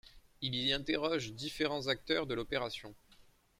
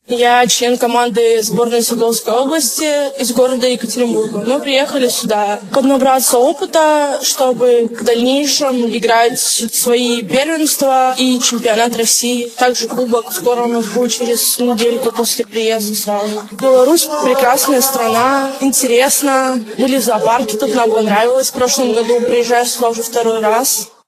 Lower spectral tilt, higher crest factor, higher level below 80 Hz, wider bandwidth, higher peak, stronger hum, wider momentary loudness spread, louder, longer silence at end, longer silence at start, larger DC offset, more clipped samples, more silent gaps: first, -4.5 dB/octave vs -2.5 dB/octave; about the same, 18 dB vs 14 dB; about the same, -60 dBFS vs -60 dBFS; first, 16 kHz vs 14.5 kHz; second, -18 dBFS vs 0 dBFS; neither; first, 9 LU vs 5 LU; second, -36 LUFS vs -13 LUFS; first, 0.4 s vs 0.2 s; about the same, 0.05 s vs 0.1 s; neither; neither; neither